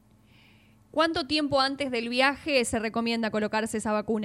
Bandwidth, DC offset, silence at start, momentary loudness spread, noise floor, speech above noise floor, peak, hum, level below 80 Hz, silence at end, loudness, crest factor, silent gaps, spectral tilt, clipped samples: 14 kHz; under 0.1%; 0.95 s; 5 LU; -58 dBFS; 31 dB; -10 dBFS; none; -56 dBFS; 0 s; -26 LUFS; 18 dB; none; -3.5 dB/octave; under 0.1%